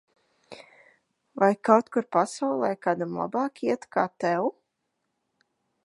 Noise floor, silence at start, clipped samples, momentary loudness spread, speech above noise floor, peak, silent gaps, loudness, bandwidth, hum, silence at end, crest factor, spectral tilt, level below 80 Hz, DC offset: -79 dBFS; 0.5 s; under 0.1%; 7 LU; 54 dB; -4 dBFS; none; -26 LUFS; 11.5 kHz; none; 1.35 s; 24 dB; -6 dB/octave; -78 dBFS; under 0.1%